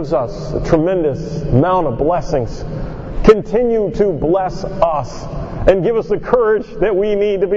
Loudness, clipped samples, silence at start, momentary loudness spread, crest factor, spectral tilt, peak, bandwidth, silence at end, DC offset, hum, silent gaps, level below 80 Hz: -16 LUFS; 0.1%; 0 s; 11 LU; 16 dB; -8 dB/octave; 0 dBFS; 7.6 kHz; 0 s; under 0.1%; none; none; -28 dBFS